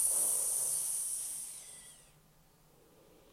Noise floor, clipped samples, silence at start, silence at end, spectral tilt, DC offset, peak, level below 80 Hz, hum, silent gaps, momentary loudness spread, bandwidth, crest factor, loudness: -65 dBFS; under 0.1%; 0 s; 1.3 s; 1 dB/octave; under 0.1%; -20 dBFS; -72 dBFS; none; none; 21 LU; 16.5 kHz; 18 dB; -32 LUFS